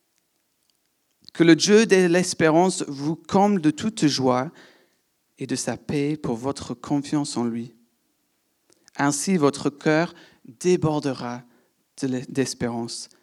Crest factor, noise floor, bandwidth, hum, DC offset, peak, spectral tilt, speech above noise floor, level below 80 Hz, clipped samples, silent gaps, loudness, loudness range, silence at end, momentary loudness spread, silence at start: 20 dB; -70 dBFS; 13.5 kHz; none; under 0.1%; -4 dBFS; -5 dB/octave; 49 dB; -64 dBFS; under 0.1%; none; -22 LUFS; 8 LU; 0.15 s; 15 LU; 1.35 s